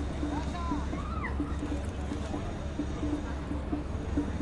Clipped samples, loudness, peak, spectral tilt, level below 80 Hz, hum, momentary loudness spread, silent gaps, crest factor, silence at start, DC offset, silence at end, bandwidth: under 0.1%; -35 LUFS; -18 dBFS; -7 dB/octave; -38 dBFS; none; 2 LU; none; 14 dB; 0 s; under 0.1%; 0 s; 11 kHz